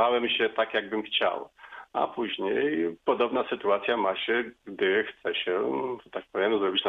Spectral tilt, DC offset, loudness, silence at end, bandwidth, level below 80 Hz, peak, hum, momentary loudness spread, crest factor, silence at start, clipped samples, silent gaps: -6 dB/octave; under 0.1%; -28 LUFS; 0 s; 4.7 kHz; -70 dBFS; -12 dBFS; none; 9 LU; 16 dB; 0 s; under 0.1%; none